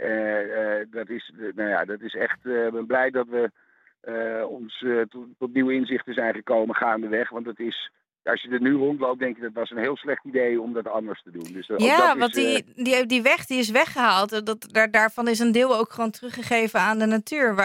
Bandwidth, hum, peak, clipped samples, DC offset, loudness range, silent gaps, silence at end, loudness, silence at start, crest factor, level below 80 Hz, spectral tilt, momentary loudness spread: 17 kHz; none; -4 dBFS; under 0.1%; under 0.1%; 6 LU; none; 0 s; -23 LUFS; 0 s; 20 dB; -72 dBFS; -4 dB/octave; 13 LU